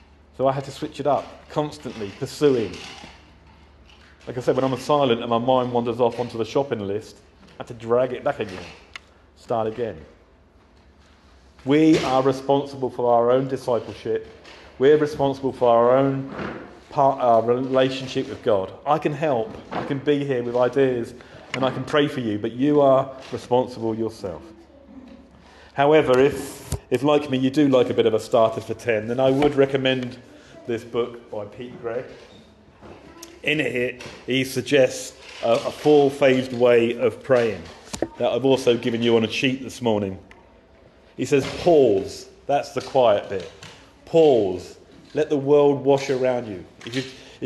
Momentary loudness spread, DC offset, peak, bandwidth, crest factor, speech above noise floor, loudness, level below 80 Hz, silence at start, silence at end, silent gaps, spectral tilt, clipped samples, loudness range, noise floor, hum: 17 LU; under 0.1%; -6 dBFS; 12.5 kHz; 16 dB; 33 dB; -21 LUFS; -54 dBFS; 0.4 s; 0 s; none; -6 dB/octave; under 0.1%; 7 LU; -54 dBFS; none